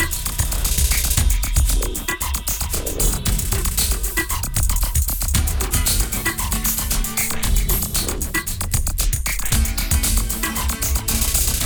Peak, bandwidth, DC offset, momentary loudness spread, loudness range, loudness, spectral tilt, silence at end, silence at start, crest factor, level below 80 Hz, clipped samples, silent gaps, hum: 0 dBFS; over 20 kHz; under 0.1%; 4 LU; 1 LU; -20 LUFS; -2.5 dB/octave; 0 s; 0 s; 18 dB; -22 dBFS; under 0.1%; none; none